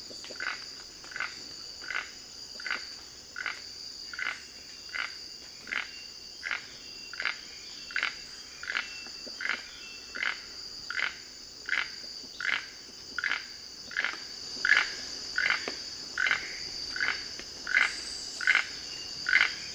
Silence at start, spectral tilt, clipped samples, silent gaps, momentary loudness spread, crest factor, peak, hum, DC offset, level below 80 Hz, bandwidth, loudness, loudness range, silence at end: 0 s; 0.5 dB/octave; under 0.1%; none; 16 LU; 28 dB; -8 dBFS; none; under 0.1%; -64 dBFS; over 20 kHz; -32 LUFS; 8 LU; 0 s